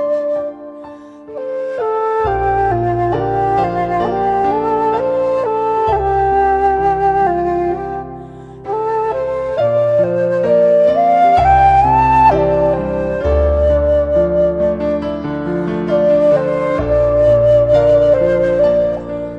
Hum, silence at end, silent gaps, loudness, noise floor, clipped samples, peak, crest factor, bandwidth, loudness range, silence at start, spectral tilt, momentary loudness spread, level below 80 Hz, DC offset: none; 0 s; none; -14 LUFS; -34 dBFS; under 0.1%; -2 dBFS; 12 dB; 7.4 kHz; 6 LU; 0 s; -8.5 dB/octave; 11 LU; -30 dBFS; under 0.1%